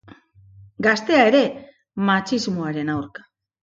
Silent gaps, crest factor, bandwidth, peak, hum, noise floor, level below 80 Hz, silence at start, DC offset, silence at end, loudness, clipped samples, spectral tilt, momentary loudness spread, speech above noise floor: none; 20 dB; 7.8 kHz; -2 dBFS; none; -49 dBFS; -60 dBFS; 0.6 s; under 0.1%; 0.55 s; -20 LUFS; under 0.1%; -5.5 dB/octave; 17 LU; 30 dB